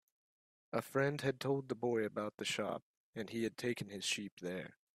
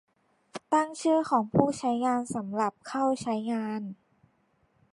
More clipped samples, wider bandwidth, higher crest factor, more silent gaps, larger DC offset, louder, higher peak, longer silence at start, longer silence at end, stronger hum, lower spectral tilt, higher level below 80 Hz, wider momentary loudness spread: neither; first, 15.5 kHz vs 11.5 kHz; second, 20 dB vs 26 dB; first, 2.34-2.38 s, 2.82-3.13 s, 4.32-4.37 s vs none; neither; second, -39 LUFS vs -28 LUFS; second, -20 dBFS vs -4 dBFS; first, 0.75 s vs 0.55 s; second, 0.25 s vs 1 s; neither; second, -4.5 dB/octave vs -6 dB/octave; second, -78 dBFS vs -64 dBFS; about the same, 8 LU vs 10 LU